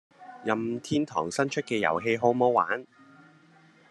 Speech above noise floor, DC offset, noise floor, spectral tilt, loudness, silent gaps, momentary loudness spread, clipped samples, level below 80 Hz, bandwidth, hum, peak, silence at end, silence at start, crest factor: 31 dB; under 0.1%; -58 dBFS; -5 dB/octave; -27 LUFS; none; 7 LU; under 0.1%; -72 dBFS; 12 kHz; none; -8 dBFS; 1.1 s; 0.2 s; 20 dB